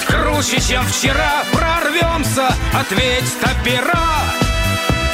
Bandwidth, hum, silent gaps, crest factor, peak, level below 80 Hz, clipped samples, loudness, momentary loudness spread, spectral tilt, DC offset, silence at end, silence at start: 16.5 kHz; none; none; 12 dB; -4 dBFS; -24 dBFS; under 0.1%; -15 LUFS; 2 LU; -3.5 dB/octave; under 0.1%; 0 s; 0 s